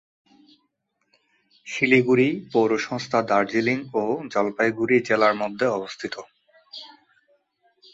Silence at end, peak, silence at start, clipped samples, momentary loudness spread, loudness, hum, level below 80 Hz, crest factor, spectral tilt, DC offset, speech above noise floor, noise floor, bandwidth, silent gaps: 1.05 s; -6 dBFS; 1.65 s; under 0.1%; 15 LU; -22 LUFS; none; -66 dBFS; 20 dB; -5.5 dB/octave; under 0.1%; 52 dB; -73 dBFS; 7.8 kHz; none